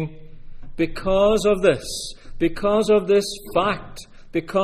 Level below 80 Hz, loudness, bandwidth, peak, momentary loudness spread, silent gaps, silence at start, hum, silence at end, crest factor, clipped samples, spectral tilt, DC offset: -38 dBFS; -21 LUFS; 15 kHz; -4 dBFS; 15 LU; none; 0 s; none; 0 s; 18 dB; under 0.1%; -5 dB/octave; under 0.1%